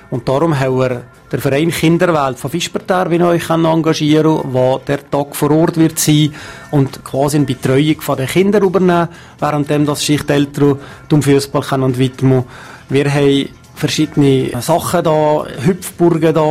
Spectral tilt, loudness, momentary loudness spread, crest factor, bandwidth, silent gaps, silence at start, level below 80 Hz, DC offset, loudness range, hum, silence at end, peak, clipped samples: -6 dB/octave; -14 LUFS; 7 LU; 12 dB; 16 kHz; none; 0.1 s; -44 dBFS; under 0.1%; 1 LU; none; 0 s; -2 dBFS; under 0.1%